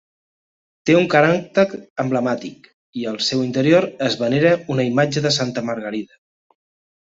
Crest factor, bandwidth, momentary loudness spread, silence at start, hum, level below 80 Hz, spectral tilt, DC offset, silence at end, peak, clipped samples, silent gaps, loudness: 18 dB; 8 kHz; 12 LU; 0.85 s; none; -60 dBFS; -5.5 dB/octave; under 0.1%; 1 s; -2 dBFS; under 0.1%; 1.90-1.96 s, 2.74-2.93 s; -19 LUFS